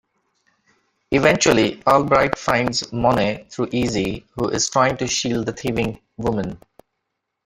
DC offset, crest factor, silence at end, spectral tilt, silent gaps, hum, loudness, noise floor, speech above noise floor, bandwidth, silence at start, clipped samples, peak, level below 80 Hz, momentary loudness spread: under 0.1%; 20 dB; 0.9 s; -4 dB/octave; none; none; -20 LUFS; -78 dBFS; 58 dB; 16 kHz; 1.1 s; under 0.1%; 0 dBFS; -46 dBFS; 11 LU